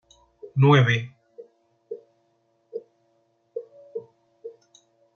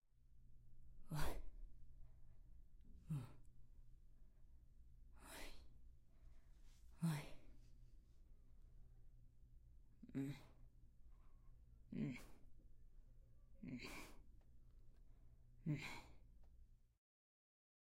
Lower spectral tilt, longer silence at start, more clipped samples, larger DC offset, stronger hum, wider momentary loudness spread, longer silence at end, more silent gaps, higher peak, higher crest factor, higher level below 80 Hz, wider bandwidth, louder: first, -7.5 dB/octave vs -6 dB/octave; first, 0.45 s vs 0.05 s; neither; neither; neither; first, 27 LU vs 20 LU; second, 0.65 s vs 1.15 s; neither; first, -4 dBFS vs -28 dBFS; about the same, 22 dB vs 24 dB; about the same, -66 dBFS vs -62 dBFS; second, 6.8 kHz vs 16 kHz; first, -20 LUFS vs -52 LUFS